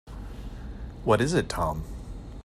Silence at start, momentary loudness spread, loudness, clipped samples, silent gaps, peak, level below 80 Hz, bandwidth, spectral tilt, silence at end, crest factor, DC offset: 0.05 s; 18 LU; -27 LUFS; under 0.1%; none; -8 dBFS; -40 dBFS; 15.5 kHz; -5.5 dB/octave; 0 s; 22 dB; under 0.1%